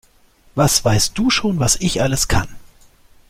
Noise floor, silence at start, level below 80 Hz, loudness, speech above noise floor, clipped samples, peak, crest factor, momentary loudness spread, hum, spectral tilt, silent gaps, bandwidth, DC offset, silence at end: -52 dBFS; 0.55 s; -34 dBFS; -17 LUFS; 36 dB; under 0.1%; 0 dBFS; 18 dB; 6 LU; none; -3.5 dB/octave; none; 16.5 kHz; under 0.1%; 0.6 s